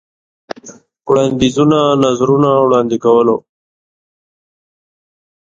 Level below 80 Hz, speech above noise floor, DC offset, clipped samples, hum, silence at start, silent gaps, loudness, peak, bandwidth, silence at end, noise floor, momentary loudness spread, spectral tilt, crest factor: -50 dBFS; 28 dB; under 0.1%; under 0.1%; none; 0.65 s; none; -12 LUFS; 0 dBFS; 7.8 kHz; 2.1 s; -39 dBFS; 19 LU; -6.5 dB/octave; 14 dB